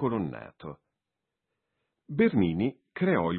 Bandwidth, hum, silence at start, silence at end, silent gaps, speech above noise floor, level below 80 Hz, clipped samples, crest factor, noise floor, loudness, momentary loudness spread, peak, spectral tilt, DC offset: 4.4 kHz; none; 0 s; 0 s; none; 59 dB; -62 dBFS; under 0.1%; 18 dB; -87 dBFS; -28 LUFS; 20 LU; -12 dBFS; -11.5 dB/octave; under 0.1%